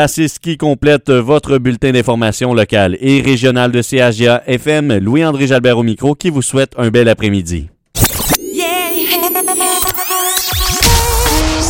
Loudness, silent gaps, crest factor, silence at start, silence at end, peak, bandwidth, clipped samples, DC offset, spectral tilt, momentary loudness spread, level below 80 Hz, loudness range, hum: -12 LUFS; none; 12 dB; 0 s; 0 s; 0 dBFS; 17.5 kHz; under 0.1%; 0.1%; -4.5 dB/octave; 4 LU; -26 dBFS; 2 LU; none